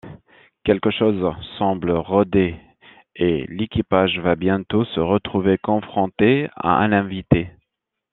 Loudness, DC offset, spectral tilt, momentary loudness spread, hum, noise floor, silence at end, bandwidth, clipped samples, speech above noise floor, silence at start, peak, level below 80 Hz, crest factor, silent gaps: -20 LUFS; under 0.1%; -10.5 dB/octave; 7 LU; none; -79 dBFS; 0.65 s; 4.1 kHz; under 0.1%; 60 dB; 0.05 s; -2 dBFS; -46 dBFS; 18 dB; none